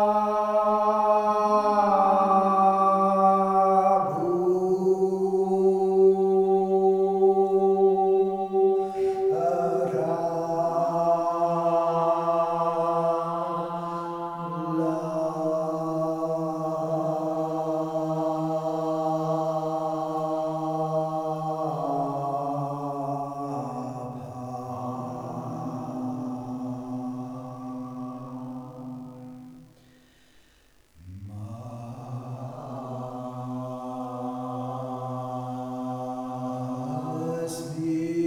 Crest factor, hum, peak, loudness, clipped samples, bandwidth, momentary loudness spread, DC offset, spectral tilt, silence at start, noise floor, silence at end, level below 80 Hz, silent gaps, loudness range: 18 dB; none; -8 dBFS; -26 LUFS; under 0.1%; 13 kHz; 16 LU; under 0.1%; -8 dB/octave; 0 s; -59 dBFS; 0 s; -66 dBFS; none; 16 LU